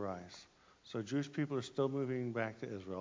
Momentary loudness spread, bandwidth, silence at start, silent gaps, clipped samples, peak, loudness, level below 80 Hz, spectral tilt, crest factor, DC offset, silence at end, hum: 11 LU; 7.6 kHz; 0 s; none; under 0.1%; -22 dBFS; -40 LUFS; -72 dBFS; -6.5 dB/octave; 18 dB; under 0.1%; 0 s; none